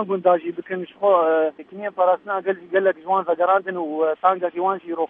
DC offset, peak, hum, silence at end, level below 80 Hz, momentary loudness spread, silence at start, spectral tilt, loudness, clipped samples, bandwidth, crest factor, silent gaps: under 0.1%; -4 dBFS; none; 0.05 s; -78 dBFS; 9 LU; 0 s; -9 dB/octave; -21 LUFS; under 0.1%; 3.8 kHz; 16 dB; none